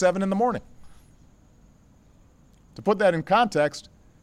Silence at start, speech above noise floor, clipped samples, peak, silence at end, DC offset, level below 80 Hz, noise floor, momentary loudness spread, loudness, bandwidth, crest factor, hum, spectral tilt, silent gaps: 0 s; 33 dB; under 0.1%; -10 dBFS; 0.4 s; under 0.1%; -56 dBFS; -55 dBFS; 11 LU; -23 LUFS; 12.5 kHz; 16 dB; none; -6 dB/octave; none